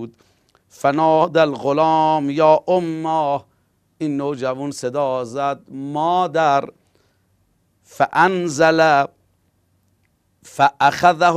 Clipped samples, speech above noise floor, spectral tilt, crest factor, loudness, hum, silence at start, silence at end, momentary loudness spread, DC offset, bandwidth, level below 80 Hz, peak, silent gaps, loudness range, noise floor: under 0.1%; 46 dB; -5.5 dB/octave; 18 dB; -18 LUFS; none; 0 s; 0 s; 11 LU; under 0.1%; 14.5 kHz; -62 dBFS; 0 dBFS; none; 5 LU; -63 dBFS